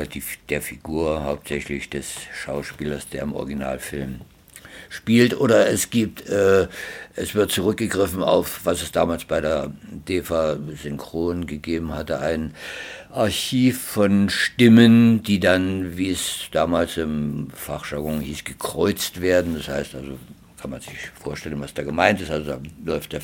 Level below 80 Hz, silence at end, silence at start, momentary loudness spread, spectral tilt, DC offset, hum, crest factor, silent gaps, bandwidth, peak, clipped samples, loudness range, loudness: -44 dBFS; 0 s; 0 s; 15 LU; -5 dB/octave; under 0.1%; none; 22 dB; none; 18 kHz; 0 dBFS; under 0.1%; 10 LU; -22 LUFS